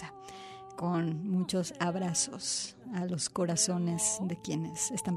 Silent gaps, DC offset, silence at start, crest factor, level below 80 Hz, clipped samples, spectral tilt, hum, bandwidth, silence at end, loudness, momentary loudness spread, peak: none; under 0.1%; 0 s; 18 dB; -68 dBFS; under 0.1%; -4 dB/octave; none; 14 kHz; 0 s; -32 LUFS; 12 LU; -16 dBFS